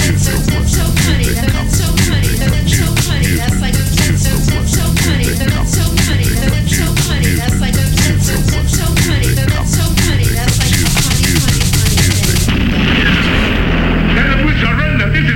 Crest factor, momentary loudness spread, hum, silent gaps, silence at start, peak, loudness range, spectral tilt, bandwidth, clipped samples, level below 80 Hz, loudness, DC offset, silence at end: 12 dB; 3 LU; none; none; 0 s; 0 dBFS; 1 LU; -4.5 dB/octave; 18.5 kHz; under 0.1%; -18 dBFS; -12 LUFS; under 0.1%; 0 s